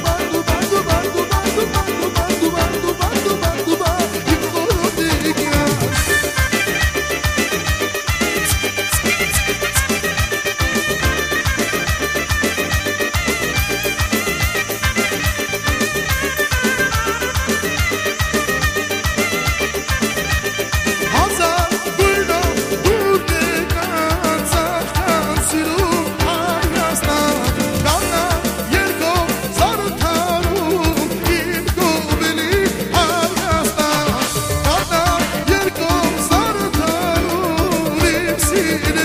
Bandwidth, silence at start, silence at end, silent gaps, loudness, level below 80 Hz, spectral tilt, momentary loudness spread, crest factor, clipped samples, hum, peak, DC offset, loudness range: 15.5 kHz; 0 s; 0 s; none; -17 LUFS; -28 dBFS; -3.5 dB/octave; 3 LU; 16 dB; under 0.1%; none; -2 dBFS; under 0.1%; 1 LU